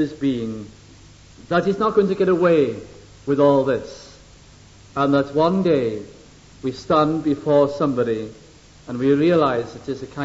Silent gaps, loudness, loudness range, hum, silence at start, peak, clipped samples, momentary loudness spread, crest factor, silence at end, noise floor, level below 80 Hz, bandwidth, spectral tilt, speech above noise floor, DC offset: none; -20 LUFS; 2 LU; none; 0 s; -4 dBFS; under 0.1%; 16 LU; 16 dB; 0 s; -46 dBFS; -52 dBFS; 8 kHz; -7.5 dB/octave; 27 dB; under 0.1%